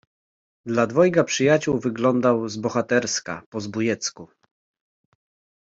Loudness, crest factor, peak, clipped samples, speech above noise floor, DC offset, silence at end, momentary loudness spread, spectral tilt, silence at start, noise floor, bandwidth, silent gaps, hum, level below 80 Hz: -22 LUFS; 18 dB; -4 dBFS; under 0.1%; over 68 dB; under 0.1%; 1.35 s; 12 LU; -4.5 dB/octave; 0.65 s; under -90 dBFS; 7.8 kHz; 3.46-3.52 s; none; -62 dBFS